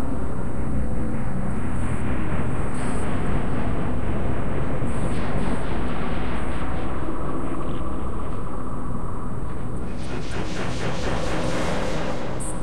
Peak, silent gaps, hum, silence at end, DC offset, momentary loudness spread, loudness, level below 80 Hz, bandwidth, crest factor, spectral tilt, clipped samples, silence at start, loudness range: -8 dBFS; none; none; 0 s; 10%; 5 LU; -28 LUFS; -32 dBFS; 12.5 kHz; 14 dB; -6.5 dB/octave; under 0.1%; 0 s; 4 LU